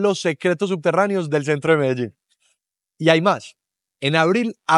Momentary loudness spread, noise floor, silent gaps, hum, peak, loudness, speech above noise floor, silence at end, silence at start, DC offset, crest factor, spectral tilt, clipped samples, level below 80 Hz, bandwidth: 7 LU; -72 dBFS; none; none; 0 dBFS; -19 LUFS; 54 dB; 0 s; 0 s; under 0.1%; 20 dB; -5.5 dB/octave; under 0.1%; -70 dBFS; 11.5 kHz